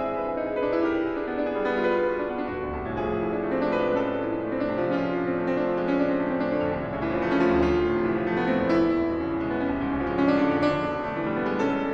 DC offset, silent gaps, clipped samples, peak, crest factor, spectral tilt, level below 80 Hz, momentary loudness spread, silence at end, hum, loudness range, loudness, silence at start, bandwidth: under 0.1%; none; under 0.1%; -10 dBFS; 14 dB; -8 dB/octave; -46 dBFS; 6 LU; 0 s; none; 3 LU; -26 LUFS; 0 s; 7.2 kHz